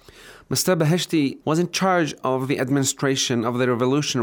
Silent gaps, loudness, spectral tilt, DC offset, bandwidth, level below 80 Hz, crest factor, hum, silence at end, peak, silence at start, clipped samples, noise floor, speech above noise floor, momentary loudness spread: none; -21 LUFS; -4.5 dB/octave; under 0.1%; over 20 kHz; -62 dBFS; 14 dB; none; 0 s; -8 dBFS; 0.2 s; under 0.1%; -46 dBFS; 25 dB; 3 LU